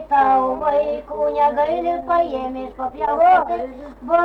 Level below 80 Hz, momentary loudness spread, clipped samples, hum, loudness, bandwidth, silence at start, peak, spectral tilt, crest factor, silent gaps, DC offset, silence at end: -46 dBFS; 13 LU; under 0.1%; none; -19 LUFS; 5.8 kHz; 0 s; -6 dBFS; -6.5 dB/octave; 12 dB; none; under 0.1%; 0 s